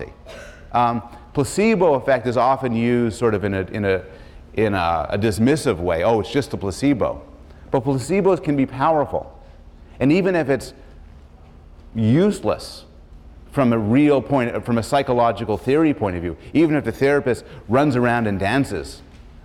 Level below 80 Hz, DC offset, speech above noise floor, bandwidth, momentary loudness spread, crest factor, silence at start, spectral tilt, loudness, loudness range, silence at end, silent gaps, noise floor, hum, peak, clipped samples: -44 dBFS; under 0.1%; 25 dB; 14 kHz; 11 LU; 14 dB; 0 s; -6.5 dB/octave; -20 LUFS; 3 LU; 0.05 s; none; -44 dBFS; none; -6 dBFS; under 0.1%